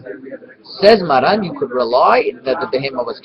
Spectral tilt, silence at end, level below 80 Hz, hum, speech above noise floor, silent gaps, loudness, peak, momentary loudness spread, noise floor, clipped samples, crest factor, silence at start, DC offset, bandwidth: -6.5 dB/octave; 0.05 s; -52 dBFS; none; 19 dB; none; -14 LUFS; 0 dBFS; 21 LU; -34 dBFS; under 0.1%; 16 dB; 0.05 s; under 0.1%; 9.2 kHz